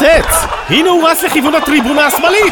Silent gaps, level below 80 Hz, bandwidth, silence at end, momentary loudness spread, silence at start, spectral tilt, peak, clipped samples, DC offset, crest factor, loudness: none; -28 dBFS; over 20 kHz; 0 s; 4 LU; 0 s; -3 dB/octave; 0 dBFS; under 0.1%; under 0.1%; 10 dB; -10 LUFS